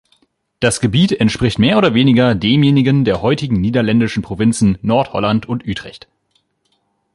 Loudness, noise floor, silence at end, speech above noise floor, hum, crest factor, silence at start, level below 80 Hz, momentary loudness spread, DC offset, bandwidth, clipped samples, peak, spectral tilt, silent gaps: -14 LUFS; -64 dBFS; 1.2 s; 51 dB; none; 14 dB; 0.6 s; -40 dBFS; 7 LU; under 0.1%; 11.5 kHz; under 0.1%; 0 dBFS; -6 dB/octave; none